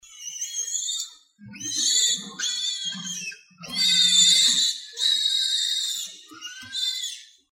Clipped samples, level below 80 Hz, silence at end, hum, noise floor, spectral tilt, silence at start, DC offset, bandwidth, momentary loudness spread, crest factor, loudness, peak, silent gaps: under 0.1%; -74 dBFS; 0.25 s; none; -46 dBFS; 2 dB/octave; 0.1 s; under 0.1%; 16.5 kHz; 20 LU; 20 dB; -21 LUFS; -6 dBFS; none